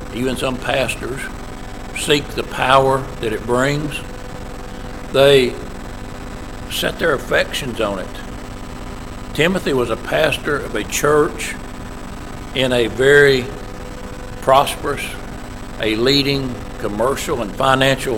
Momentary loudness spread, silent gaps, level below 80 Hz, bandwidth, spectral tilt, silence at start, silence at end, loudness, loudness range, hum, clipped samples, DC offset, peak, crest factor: 18 LU; none; -32 dBFS; 17 kHz; -4 dB/octave; 0 s; 0 s; -17 LUFS; 4 LU; none; under 0.1%; under 0.1%; 0 dBFS; 18 dB